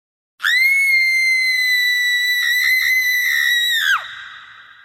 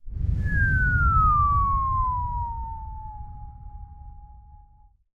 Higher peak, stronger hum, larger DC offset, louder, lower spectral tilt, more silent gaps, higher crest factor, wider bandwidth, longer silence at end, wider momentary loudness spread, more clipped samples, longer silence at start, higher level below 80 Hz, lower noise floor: first, -6 dBFS vs -10 dBFS; neither; neither; first, -14 LUFS vs -23 LUFS; second, 5 dB/octave vs -9 dB/octave; neither; about the same, 12 dB vs 16 dB; first, 17 kHz vs 3 kHz; second, 0.25 s vs 0.6 s; second, 5 LU vs 24 LU; neither; first, 0.4 s vs 0.05 s; second, -64 dBFS vs -30 dBFS; second, -41 dBFS vs -55 dBFS